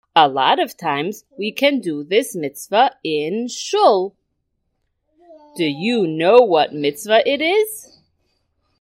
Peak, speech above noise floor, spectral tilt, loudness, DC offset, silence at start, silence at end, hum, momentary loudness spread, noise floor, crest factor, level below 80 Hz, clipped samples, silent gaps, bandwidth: 0 dBFS; 54 dB; -4 dB/octave; -18 LUFS; under 0.1%; 0.15 s; 1.05 s; none; 13 LU; -71 dBFS; 18 dB; -70 dBFS; under 0.1%; none; 16 kHz